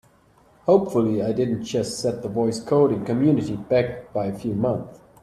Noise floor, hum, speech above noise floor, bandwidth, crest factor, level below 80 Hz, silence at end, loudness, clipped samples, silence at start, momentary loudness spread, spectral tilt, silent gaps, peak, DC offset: -56 dBFS; none; 35 dB; 13.5 kHz; 18 dB; -54 dBFS; 0.25 s; -23 LUFS; under 0.1%; 0.65 s; 8 LU; -7 dB/octave; none; -4 dBFS; under 0.1%